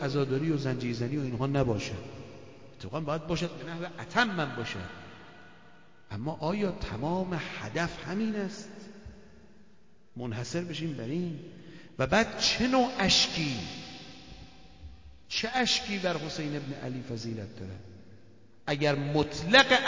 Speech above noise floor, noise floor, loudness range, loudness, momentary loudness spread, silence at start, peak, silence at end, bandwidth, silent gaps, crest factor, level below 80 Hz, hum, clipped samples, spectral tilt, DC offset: 33 dB; -62 dBFS; 9 LU; -30 LUFS; 22 LU; 0 s; -6 dBFS; 0 s; 7.8 kHz; none; 26 dB; -54 dBFS; none; under 0.1%; -4.5 dB/octave; 0.2%